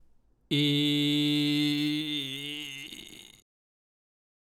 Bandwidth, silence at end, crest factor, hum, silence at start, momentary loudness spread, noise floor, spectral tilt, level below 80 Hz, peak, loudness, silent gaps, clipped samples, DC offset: 16 kHz; 1.2 s; 16 dB; none; 0.5 s; 16 LU; -61 dBFS; -5 dB/octave; -70 dBFS; -14 dBFS; -28 LUFS; none; under 0.1%; under 0.1%